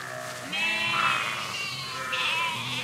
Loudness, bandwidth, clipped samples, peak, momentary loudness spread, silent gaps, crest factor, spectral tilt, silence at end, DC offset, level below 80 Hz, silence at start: -27 LUFS; 16 kHz; under 0.1%; -12 dBFS; 8 LU; none; 16 dB; -1.5 dB/octave; 0 s; under 0.1%; -74 dBFS; 0 s